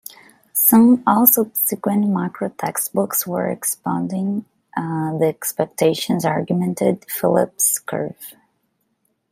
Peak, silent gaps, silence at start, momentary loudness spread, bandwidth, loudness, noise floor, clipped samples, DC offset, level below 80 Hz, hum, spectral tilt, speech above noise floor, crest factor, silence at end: 0 dBFS; none; 0.55 s; 14 LU; 16 kHz; -18 LUFS; -69 dBFS; under 0.1%; under 0.1%; -64 dBFS; none; -5 dB/octave; 50 dB; 20 dB; 1 s